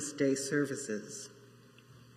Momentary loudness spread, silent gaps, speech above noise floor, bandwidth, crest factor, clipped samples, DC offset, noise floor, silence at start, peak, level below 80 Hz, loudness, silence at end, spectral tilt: 14 LU; none; 24 dB; 15 kHz; 18 dB; under 0.1%; under 0.1%; -58 dBFS; 0 s; -18 dBFS; -80 dBFS; -35 LUFS; 0 s; -4 dB/octave